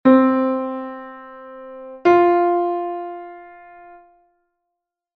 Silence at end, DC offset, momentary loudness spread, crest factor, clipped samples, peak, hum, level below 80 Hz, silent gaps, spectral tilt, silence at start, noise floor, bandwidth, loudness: 1.7 s; under 0.1%; 24 LU; 18 dB; under 0.1%; -2 dBFS; none; -64 dBFS; none; -7.5 dB/octave; 0.05 s; -80 dBFS; 6.2 kHz; -18 LUFS